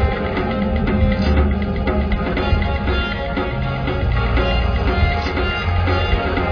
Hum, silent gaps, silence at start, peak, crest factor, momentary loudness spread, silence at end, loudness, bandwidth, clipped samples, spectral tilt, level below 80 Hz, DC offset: none; none; 0 s; -4 dBFS; 14 dB; 4 LU; 0 s; -19 LUFS; 5.4 kHz; under 0.1%; -8 dB/octave; -22 dBFS; under 0.1%